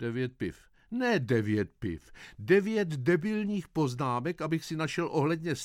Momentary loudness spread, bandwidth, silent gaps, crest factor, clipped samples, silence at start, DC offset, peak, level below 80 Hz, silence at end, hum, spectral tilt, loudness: 12 LU; 15.5 kHz; none; 18 dB; under 0.1%; 0 s; under 0.1%; -12 dBFS; -60 dBFS; 0 s; none; -6.5 dB/octave; -30 LUFS